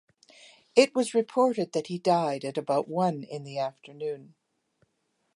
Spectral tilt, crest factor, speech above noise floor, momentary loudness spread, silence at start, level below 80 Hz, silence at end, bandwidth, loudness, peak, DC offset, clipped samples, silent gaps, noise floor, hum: -5 dB/octave; 22 dB; 49 dB; 13 LU; 0.75 s; -82 dBFS; 1.1 s; 11.5 kHz; -28 LUFS; -6 dBFS; under 0.1%; under 0.1%; none; -76 dBFS; none